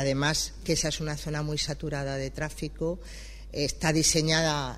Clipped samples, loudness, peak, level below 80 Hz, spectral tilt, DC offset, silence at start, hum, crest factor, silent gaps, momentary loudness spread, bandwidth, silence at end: under 0.1%; -28 LUFS; -8 dBFS; -42 dBFS; -3.5 dB/octave; under 0.1%; 0 s; none; 20 dB; none; 11 LU; 15 kHz; 0 s